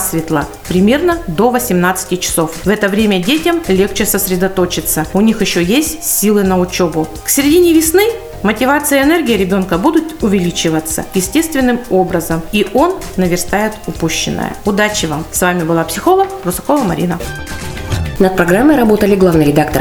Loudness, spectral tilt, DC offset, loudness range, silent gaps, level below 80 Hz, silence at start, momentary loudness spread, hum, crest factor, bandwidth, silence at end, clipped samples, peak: -13 LUFS; -4.5 dB/octave; under 0.1%; 3 LU; none; -32 dBFS; 0 s; 7 LU; none; 12 dB; over 20 kHz; 0 s; under 0.1%; 0 dBFS